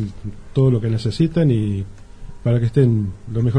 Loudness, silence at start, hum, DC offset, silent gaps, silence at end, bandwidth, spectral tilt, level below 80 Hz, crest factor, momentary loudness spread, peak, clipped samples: -19 LUFS; 0 s; none; under 0.1%; none; 0 s; 9.8 kHz; -9 dB/octave; -40 dBFS; 16 dB; 11 LU; -2 dBFS; under 0.1%